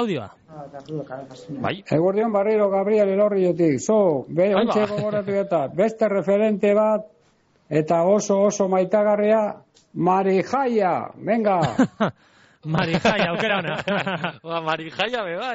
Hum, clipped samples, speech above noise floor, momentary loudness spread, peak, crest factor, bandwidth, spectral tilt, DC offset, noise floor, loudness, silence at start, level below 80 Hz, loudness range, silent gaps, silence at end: none; under 0.1%; 40 dB; 11 LU; -8 dBFS; 14 dB; 8 kHz; -5 dB/octave; under 0.1%; -61 dBFS; -21 LUFS; 0 s; -60 dBFS; 3 LU; none; 0 s